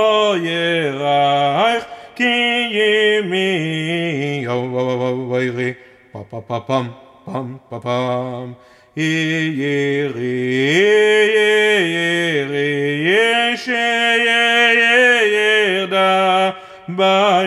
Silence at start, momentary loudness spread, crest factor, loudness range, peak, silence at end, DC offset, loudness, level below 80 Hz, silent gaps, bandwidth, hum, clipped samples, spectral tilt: 0 s; 14 LU; 14 dB; 10 LU; -2 dBFS; 0 s; under 0.1%; -15 LUFS; -66 dBFS; none; 13 kHz; none; under 0.1%; -4.5 dB/octave